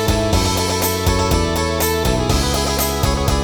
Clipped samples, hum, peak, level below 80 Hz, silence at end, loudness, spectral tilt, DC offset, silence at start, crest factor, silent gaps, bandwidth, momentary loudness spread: under 0.1%; none; -2 dBFS; -24 dBFS; 0 s; -17 LUFS; -4 dB/octave; 0.5%; 0 s; 14 dB; none; 19 kHz; 1 LU